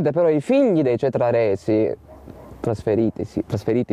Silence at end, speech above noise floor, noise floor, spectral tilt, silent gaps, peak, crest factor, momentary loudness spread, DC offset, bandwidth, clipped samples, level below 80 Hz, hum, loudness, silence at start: 0 s; 21 dB; -40 dBFS; -8.5 dB/octave; none; -8 dBFS; 12 dB; 9 LU; under 0.1%; 11.5 kHz; under 0.1%; -52 dBFS; none; -20 LUFS; 0 s